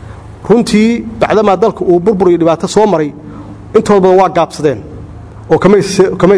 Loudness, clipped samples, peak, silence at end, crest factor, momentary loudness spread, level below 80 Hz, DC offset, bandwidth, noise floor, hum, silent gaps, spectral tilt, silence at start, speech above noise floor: -10 LUFS; 0.5%; 0 dBFS; 0 s; 10 dB; 21 LU; -38 dBFS; under 0.1%; 11 kHz; -28 dBFS; none; none; -6.5 dB/octave; 0 s; 20 dB